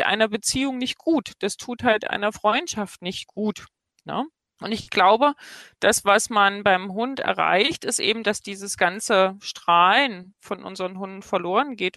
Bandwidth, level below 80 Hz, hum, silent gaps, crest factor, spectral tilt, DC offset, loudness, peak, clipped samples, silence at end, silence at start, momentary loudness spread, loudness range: 13 kHz; -60 dBFS; none; none; 18 dB; -2.5 dB/octave; under 0.1%; -22 LUFS; -6 dBFS; under 0.1%; 0.05 s; 0 s; 14 LU; 5 LU